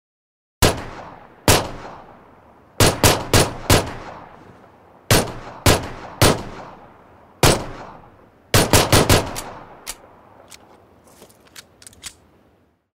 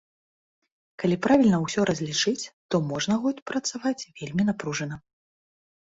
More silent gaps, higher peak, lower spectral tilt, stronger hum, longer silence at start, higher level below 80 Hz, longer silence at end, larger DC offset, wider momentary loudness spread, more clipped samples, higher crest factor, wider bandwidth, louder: second, none vs 2.53-2.69 s, 3.42-3.46 s; first, 0 dBFS vs -8 dBFS; second, -3.5 dB/octave vs -5 dB/octave; neither; second, 0.6 s vs 1 s; first, -32 dBFS vs -60 dBFS; about the same, 0.9 s vs 0.95 s; neither; first, 24 LU vs 12 LU; neither; about the same, 22 dB vs 20 dB; first, 16.5 kHz vs 8 kHz; first, -17 LUFS vs -26 LUFS